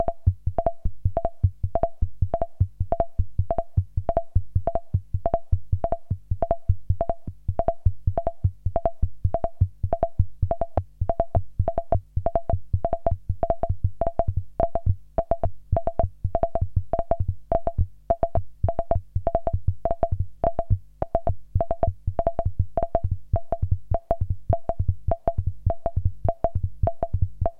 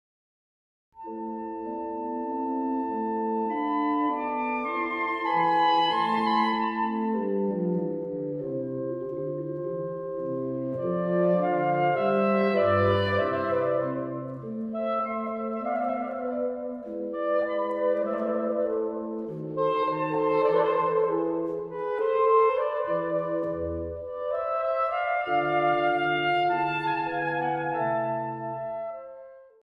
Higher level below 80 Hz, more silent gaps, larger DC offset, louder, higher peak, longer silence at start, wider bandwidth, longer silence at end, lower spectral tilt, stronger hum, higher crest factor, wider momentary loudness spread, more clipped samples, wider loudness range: first, -30 dBFS vs -60 dBFS; neither; neither; about the same, -27 LUFS vs -27 LUFS; first, -6 dBFS vs -12 dBFS; second, 0 s vs 0.95 s; second, 2.8 kHz vs 5.8 kHz; second, 0 s vs 0.2 s; first, -11.5 dB/octave vs -8 dB/octave; neither; about the same, 18 dB vs 16 dB; second, 3 LU vs 10 LU; neither; second, 1 LU vs 6 LU